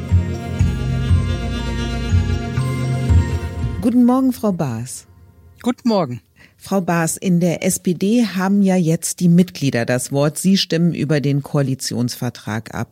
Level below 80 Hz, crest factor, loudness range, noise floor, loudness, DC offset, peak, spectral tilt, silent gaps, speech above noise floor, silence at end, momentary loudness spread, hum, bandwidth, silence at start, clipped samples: -30 dBFS; 14 dB; 3 LU; -46 dBFS; -18 LUFS; under 0.1%; -4 dBFS; -6 dB/octave; none; 28 dB; 0.05 s; 9 LU; none; 16.5 kHz; 0 s; under 0.1%